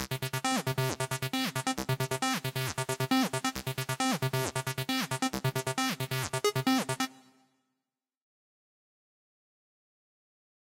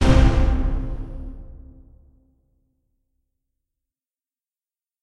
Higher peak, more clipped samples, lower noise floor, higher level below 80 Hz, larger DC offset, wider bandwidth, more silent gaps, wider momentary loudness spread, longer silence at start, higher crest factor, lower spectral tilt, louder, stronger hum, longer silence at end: second, -12 dBFS vs -2 dBFS; neither; about the same, -89 dBFS vs under -90 dBFS; second, -62 dBFS vs -24 dBFS; neither; first, 17 kHz vs 10.5 kHz; neither; second, 5 LU vs 25 LU; about the same, 0 s vs 0 s; about the same, 22 dB vs 20 dB; second, -4 dB/octave vs -7 dB/octave; second, -31 LUFS vs -22 LUFS; neither; about the same, 3.45 s vs 3.45 s